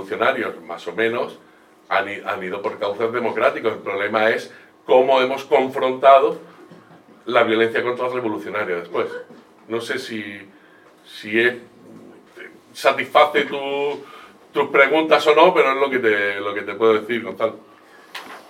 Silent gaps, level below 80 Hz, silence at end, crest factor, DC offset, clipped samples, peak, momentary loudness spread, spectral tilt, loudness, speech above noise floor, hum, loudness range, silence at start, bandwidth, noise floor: none; -78 dBFS; 0.1 s; 20 dB; under 0.1%; under 0.1%; 0 dBFS; 17 LU; -4.5 dB/octave; -19 LUFS; 31 dB; none; 9 LU; 0 s; 15.5 kHz; -50 dBFS